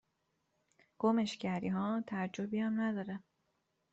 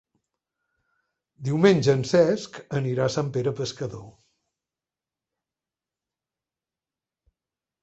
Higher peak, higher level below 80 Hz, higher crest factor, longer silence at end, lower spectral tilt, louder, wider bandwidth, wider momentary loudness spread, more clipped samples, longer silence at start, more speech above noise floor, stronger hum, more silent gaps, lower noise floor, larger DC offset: second, -18 dBFS vs -4 dBFS; second, -78 dBFS vs -62 dBFS; about the same, 20 dB vs 22 dB; second, 0.75 s vs 3.75 s; about the same, -5.5 dB/octave vs -6.5 dB/octave; second, -36 LUFS vs -23 LUFS; about the same, 8 kHz vs 8.2 kHz; second, 8 LU vs 15 LU; neither; second, 1 s vs 1.4 s; second, 46 dB vs over 67 dB; neither; neither; second, -82 dBFS vs under -90 dBFS; neither